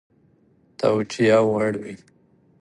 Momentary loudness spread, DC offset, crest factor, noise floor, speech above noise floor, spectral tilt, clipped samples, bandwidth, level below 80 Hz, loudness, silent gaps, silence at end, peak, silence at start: 19 LU; under 0.1%; 18 dB; -59 dBFS; 39 dB; -6 dB/octave; under 0.1%; 11.5 kHz; -62 dBFS; -21 LUFS; none; 0.65 s; -6 dBFS; 0.8 s